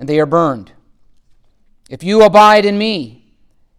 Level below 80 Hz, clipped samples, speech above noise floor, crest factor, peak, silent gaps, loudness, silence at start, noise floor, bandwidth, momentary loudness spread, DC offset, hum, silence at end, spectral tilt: -50 dBFS; under 0.1%; 41 dB; 14 dB; 0 dBFS; none; -11 LUFS; 0 s; -52 dBFS; 16 kHz; 19 LU; under 0.1%; none; 0.7 s; -5.5 dB/octave